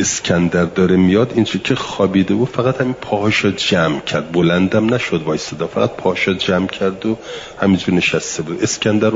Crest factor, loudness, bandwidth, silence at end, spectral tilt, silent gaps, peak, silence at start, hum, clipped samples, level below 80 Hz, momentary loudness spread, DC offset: 14 dB; -16 LUFS; 7.8 kHz; 0 s; -5 dB/octave; none; -2 dBFS; 0 s; none; under 0.1%; -50 dBFS; 6 LU; under 0.1%